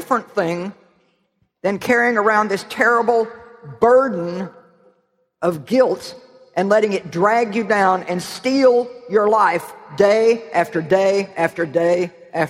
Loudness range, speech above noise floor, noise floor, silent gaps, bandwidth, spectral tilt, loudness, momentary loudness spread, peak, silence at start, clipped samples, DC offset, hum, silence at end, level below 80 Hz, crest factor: 3 LU; 49 dB; -66 dBFS; none; 15.5 kHz; -5.5 dB/octave; -18 LUFS; 11 LU; -2 dBFS; 0 s; under 0.1%; under 0.1%; none; 0 s; -62 dBFS; 16 dB